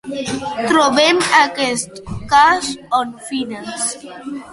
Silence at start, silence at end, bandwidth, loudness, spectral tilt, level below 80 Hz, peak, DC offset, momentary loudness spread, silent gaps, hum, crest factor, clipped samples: 0.05 s; 0 s; 11.5 kHz; -16 LUFS; -2.5 dB/octave; -46 dBFS; 0 dBFS; under 0.1%; 15 LU; none; none; 16 dB; under 0.1%